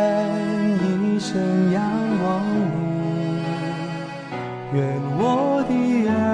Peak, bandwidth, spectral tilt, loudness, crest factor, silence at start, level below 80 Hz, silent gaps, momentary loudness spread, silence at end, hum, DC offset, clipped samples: -10 dBFS; 10 kHz; -7.5 dB/octave; -22 LUFS; 12 dB; 0 s; -56 dBFS; none; 9 LU; 0 s; none; under 0.1%; under 0.1%